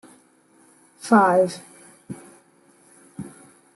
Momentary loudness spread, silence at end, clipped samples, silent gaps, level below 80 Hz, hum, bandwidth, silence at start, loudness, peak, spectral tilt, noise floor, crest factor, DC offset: 24 LU; 0.45 s; under 0.1%; none; -72 dBFS; none; 12 kHz; 1.05 s; -18 LUFS; -4 dBFS; -6 dB/octave; -57 dBFS; 20 dB; under 0.1%